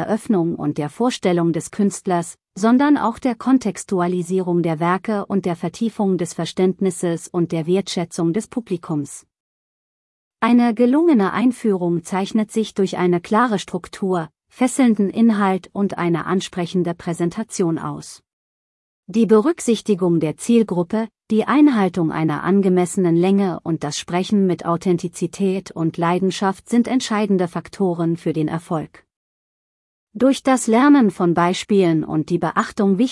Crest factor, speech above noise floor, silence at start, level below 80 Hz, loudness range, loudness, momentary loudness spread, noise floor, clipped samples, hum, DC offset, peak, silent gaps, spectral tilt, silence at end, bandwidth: 16 dB; over 72 dB; 0 s; -60 dBFS; 5 LU; -19 LUFS; 9 LU; under -90 dBFS; under 0.1%; none; under 0.1%; -4 dBFS; 9.40-10.31 s, 18.33-19.03 s, 29.16-30.07 s; -6 dB/octave; 0 s; 12 kHz